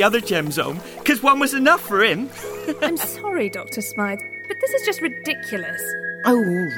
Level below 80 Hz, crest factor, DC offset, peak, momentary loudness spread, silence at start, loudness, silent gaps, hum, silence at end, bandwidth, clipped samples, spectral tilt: -60 dBFS; 18 dB; under 0.1%; -2 dBFS; 11 LU; 0 s; -21 LUFS; none; none; 0 s; 19.5 kHz; under 0.1%; -4 dB/octave